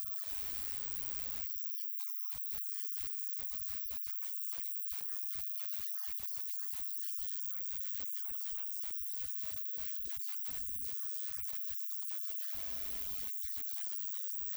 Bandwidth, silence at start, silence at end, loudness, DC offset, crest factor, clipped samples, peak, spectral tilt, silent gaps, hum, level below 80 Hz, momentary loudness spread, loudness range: over 20 kHz; 0 s; 0 s; -36 LUFS; under 0.1%; 18 dB; under 0.1%; -22 dBFS; -1 dB/octave; none; none; -64 dBFS; 1 LU; 0 LU